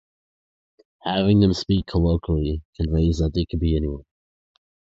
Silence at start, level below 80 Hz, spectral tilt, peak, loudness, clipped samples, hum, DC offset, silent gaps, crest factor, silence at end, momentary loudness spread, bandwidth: 1.05 s; -30 dBFS; -7.5 dB/octave; -6 dBFS; -22 LUFS; under 0.1%; none; under 0.1%; 2.65-2.73 s; 16 dB; 0.85 s; 10 LU; 7.8 kHz